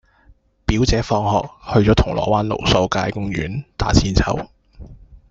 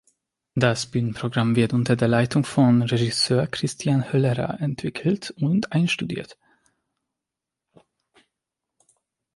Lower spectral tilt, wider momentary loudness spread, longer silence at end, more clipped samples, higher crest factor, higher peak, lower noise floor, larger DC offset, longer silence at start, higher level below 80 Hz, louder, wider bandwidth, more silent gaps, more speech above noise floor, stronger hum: about the same, -5.5 dB/octave vs -6 dB/octave; about the same, 9 LU vs 7 LU; second, 0.15 s vs 3 s; neither; about the same, 18 dB vs 20 dB; first, 0 dBFS vs -4 dBFS; second, -53 dBFS vs -86 dBFS; neither; first, 0.7 s vs 0.55 s; first, -28 dBFS vs -58 dBFS; first, -19 LUFS vs -22 LUFS; second, 7.8 kHz vs 11.5 kHz; neither; second, 35 dB vs 65 dB; neither